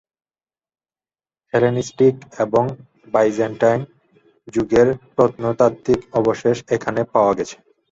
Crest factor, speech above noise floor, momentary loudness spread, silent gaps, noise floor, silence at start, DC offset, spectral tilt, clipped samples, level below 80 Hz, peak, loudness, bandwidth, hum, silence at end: 18 dB; over 72 dB; 8 LU; none; under -90 dBFS; 1.55 s; under 0.1%; -6.5 dB/octave; under 0.1%; -52 dBFS; -2 dBFS; -19 LUFS; 7.8 kHz; none; 0.35 s